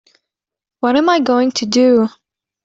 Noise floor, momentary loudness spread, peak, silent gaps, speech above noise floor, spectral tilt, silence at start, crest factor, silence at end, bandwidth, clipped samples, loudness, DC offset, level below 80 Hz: -81 dBFS; 7 LU; -2 dBFS; none; 68 dB; -4 dB/octave; 0.85 s; 14 dB; 0.55 s; 7.8 kHz; under 0.1%; -14 LUFS; under 0.1%; -60 dBFS